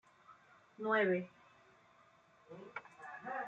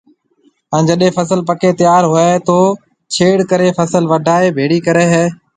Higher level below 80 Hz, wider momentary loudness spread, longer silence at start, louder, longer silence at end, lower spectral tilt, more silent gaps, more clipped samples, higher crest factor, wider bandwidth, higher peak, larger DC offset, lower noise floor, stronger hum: second, -88 dBFS vs -54 dBFS; first, 21 LU vs 5 LU; second, 0.3 s vs 0.7 s; second, -38 LUFS vs -12 LUFS; second, 0 s vs 0.25 s; first, -7 dB/octave vs -5.5 dB/octave; neither; neither; first, 22 dB vs 12 dB; second, 7.8 kHz vs 9.4 kHz; second, -20 dBFS vs 0 dBFS; neither; first, -67 dBFS vs -55 dBFS; neither